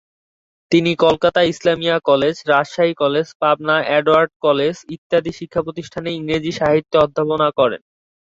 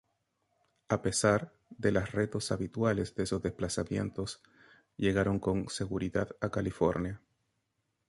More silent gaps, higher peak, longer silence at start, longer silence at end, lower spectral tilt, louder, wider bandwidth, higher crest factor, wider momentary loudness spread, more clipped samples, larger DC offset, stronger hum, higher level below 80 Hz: first, 3.35-3.40 s, 4.36-4.40 s, 4.98-5.10 s vs none; first, -2 dBFS vs -12 dBFS; second, 0.7 s vs 0.9 s; second, 0.6 s vs 0.9 s; about the same, -5.5 dB/octave vs -5.5 dB/octave; first, -17 LUFS vs -32 LUFS; second, 7.8 kHz vs 11.5 kHz; second, 16 dB vs 22 dB; about the same, 9 LU vs 10 LU; neither; neither; neither; about the same, -52 dBFS vs -52 dBFS